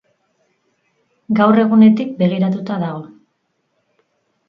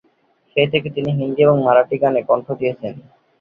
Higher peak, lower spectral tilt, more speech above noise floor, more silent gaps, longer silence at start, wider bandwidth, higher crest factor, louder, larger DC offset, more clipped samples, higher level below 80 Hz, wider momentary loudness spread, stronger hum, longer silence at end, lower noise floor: about the same, 0 dBFS vs -2 dBFS; about the same, -9.5 dB/octave vs -9.5 dB/octave; first, 54 dB vs 43 dB; neither; first, 1.3 s vs 0.55 s; about the same, 5.2 kHz vs 5 kHz; about the same, 18 dB vs 16 dB; about the same, -15 LUFS vs -17 LUFS; neither; neither; second, -64 dBFS vs -58 dBFS; first, 12 LU vs 9 LU; neither; first, 1.4 s vs 0.4 s; first, -68 dBFS vs -60 dBFS